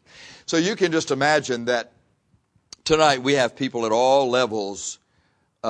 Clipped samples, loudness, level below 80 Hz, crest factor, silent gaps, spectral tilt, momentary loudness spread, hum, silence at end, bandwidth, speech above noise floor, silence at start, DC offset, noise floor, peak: under 0.1%; -21 LUFS; -58 dBFS; 18 dB; none; -3.5 dB/octave; 14 LU; none; 0 s; 10.5 kHz; 45 dB; 0.2 s; under 0.1%; -66 dBFS; -4 dBFS